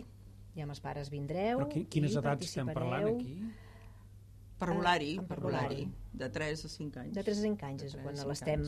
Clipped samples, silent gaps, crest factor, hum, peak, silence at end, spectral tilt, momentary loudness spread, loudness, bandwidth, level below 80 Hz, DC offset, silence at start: under 0.1%; none; 20 dB; none; -16 dBFS; 0 s; -6 dB/octave; 21 LU; -36 LUFS; 13.5 kHz; -54 dBFS; under 0.1%; 0 s